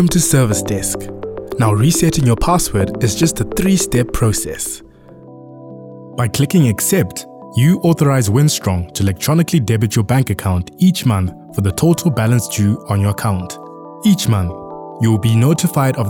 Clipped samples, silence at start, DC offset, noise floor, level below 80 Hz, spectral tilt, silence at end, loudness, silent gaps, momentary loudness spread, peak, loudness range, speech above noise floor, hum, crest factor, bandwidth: under 0.1%; 0 s; under 0.1%; -39 dBFS; -34 dBFS; -5.5 dB/octave; 0 s; -15 LUFS; none; 11 LU; -2 dBFS; 3 LU; 25 dB; none; 12 dB; 18 kHz